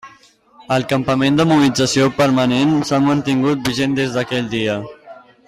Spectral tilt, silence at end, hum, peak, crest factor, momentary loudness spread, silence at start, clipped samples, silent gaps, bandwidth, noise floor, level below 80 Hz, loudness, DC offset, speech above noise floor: -5.5 dB/octave; 0.35 s; none; -4 dBFS; 12 dB; 7 LU; 0.05 s; under 0.1%; none; 14.5 kHz; -49 dBFS; -50 dBFS; -16 LUFS; under 0.1%; 33 dB